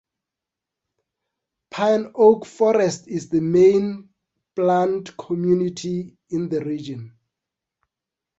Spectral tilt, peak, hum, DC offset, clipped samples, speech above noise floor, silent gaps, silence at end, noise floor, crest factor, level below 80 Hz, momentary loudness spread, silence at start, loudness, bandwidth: -6.5 dB/octave; -2 dBFS; none; under 0.1%; under 0.1%; 67 dB; none; 1.3 s; -86 dBFS; 20 dB; -62 dBFS; 14 LU; 1.75 s; -20 LUFS; 8 kHz